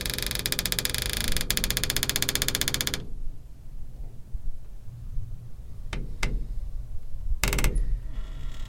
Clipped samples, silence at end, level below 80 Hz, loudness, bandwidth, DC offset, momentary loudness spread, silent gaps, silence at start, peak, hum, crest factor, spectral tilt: under 0.1%; 0 s; -32 dBFS; -28 LUFS; 17 kHz; under 0.1%; 19 LU; none; 0 s; -2 dBFS; none; 26 dB; -2 dB/octave